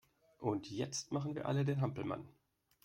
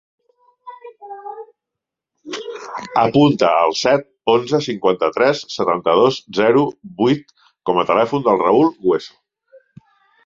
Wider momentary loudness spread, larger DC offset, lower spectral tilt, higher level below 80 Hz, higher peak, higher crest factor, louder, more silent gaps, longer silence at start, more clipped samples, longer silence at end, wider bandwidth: second, 8 LU vs 19 LU; neither; about the same, -6 dB/octave vs -5.5 dB/octave; second, -72 dBFS vs -58 dBFS; second, -22 dBFS vs 0 dBFS; about the same, 18 dB vs 18 dB; second, -39 LUFS vs -17 LUFS; neither; second, 0.4 s vs 0.65 s; neither; second, 0.55 s vs 1.2 s; first, 11 kHz vs 7.6 kHz